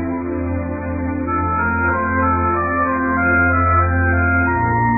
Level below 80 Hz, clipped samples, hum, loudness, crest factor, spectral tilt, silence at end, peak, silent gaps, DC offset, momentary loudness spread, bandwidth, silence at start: -30 dBFS; under 0.1%; none; -17 LUFS; 12 dB; -15.5 dB/octave; 0 s; -4 dBFS; none; under 0.1%; 8 LU; 2.6 kHz; 0 s